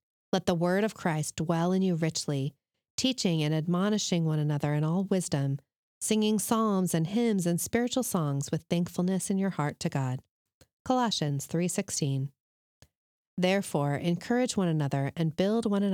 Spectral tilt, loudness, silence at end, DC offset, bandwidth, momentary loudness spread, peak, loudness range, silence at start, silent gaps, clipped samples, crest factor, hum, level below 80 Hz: -5.5 dB/octave; -29 LUFS; 0 s; under 0.1%; 18.5 kHz; 6 LU; -12 dBFS; 3 LU; 0.35 s; 2.90-2.98 s, 5.76-6.01 s, 10.31-10.46 s, 10.54-10.61 s, 10.73-10.85 s, 12.40-12.81 s, 12.95-13.37 s; under 0.1%; 16 dB; none; -68 dBFS